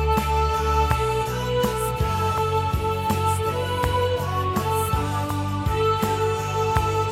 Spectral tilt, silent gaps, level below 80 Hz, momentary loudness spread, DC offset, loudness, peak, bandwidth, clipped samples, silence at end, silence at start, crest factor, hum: -5.5 dB/octave; none; -32 dBFS; 3 LU; under 0.1%; -23 LUFS; -2 dBFS; 16.5 kHz; under 0.1%; 0 s; 0 s; 20 dB; none